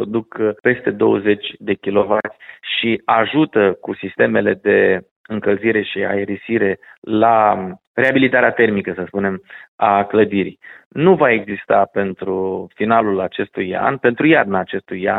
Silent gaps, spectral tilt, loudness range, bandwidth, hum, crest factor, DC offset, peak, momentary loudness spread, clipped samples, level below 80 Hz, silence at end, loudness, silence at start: 5.11-5.24 s, 6.98-7.02 s, 7.87-7.94 s, 9.68-9.78 s, 10.86-10.91 s; -8.5 dB/octave; 2 LU; 4.1 kHz; none; 16 dB; under 0.1%; 0 dBFS; 10 LU; under 0.1%; -58 dBFS; 0 s; -17 LUFS; 0 s